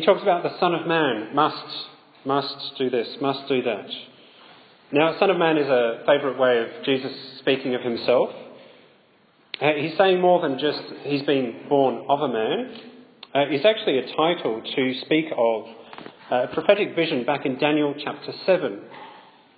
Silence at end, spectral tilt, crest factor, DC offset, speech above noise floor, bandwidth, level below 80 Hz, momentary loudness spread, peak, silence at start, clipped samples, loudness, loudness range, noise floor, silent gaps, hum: 0.35 s; -9 dB/octave; 20 dB; under 0.1%; 36 dB; 5 kHz; -76 dBFS; 13 LU; -2 dBFS; 0 s; under 0.1%; -23 LUFS; 3 LU; -58 dBFS; none; none